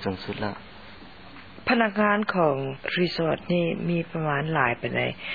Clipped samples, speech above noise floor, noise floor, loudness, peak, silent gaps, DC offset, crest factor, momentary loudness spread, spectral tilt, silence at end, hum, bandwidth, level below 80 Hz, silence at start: under 0.1%; 20 dB; -46 dBFS; -25 LUFS; -6 dBFS; none; 0.3%; 20 dB; 22 LU; -8 dB/octave; 0 s; none; 5 kHz; -56 dBFS; 0 s